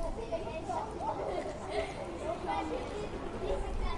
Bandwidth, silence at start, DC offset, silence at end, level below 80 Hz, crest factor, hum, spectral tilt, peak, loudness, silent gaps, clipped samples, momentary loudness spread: 11.5 kHz; 0 s; under 0.1%; 0 s; -44 dBFS; 16 dB; none; -5.5 dB/octave; -20 dBFS; -38 LUFS; none; under 0.1%; 4 LU